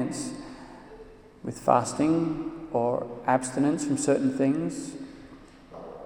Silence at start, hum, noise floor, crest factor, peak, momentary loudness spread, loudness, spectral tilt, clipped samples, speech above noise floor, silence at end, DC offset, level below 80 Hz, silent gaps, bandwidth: 0 s; none; -49 dBFS; 22 dB; -6 dBFS; 22 LU; -27 LUFS; -5.5 dB/octave; under 0.1%; 23 dB; 0 s; under 0.1%; -58 dBFS; none; 12.5 kHz